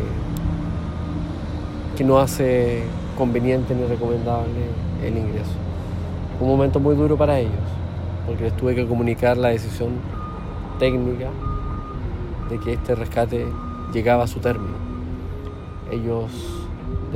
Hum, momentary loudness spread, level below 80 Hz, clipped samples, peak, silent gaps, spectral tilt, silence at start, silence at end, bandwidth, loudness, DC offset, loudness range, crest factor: none; 12 LU; -34 dBFS; under 0.1%; -4 dBFS; none; -7.5 dB/octave; 0 s; 0 s; 16 kHz; -23 LUFS; under 0.1%; 4 LU; 18 dB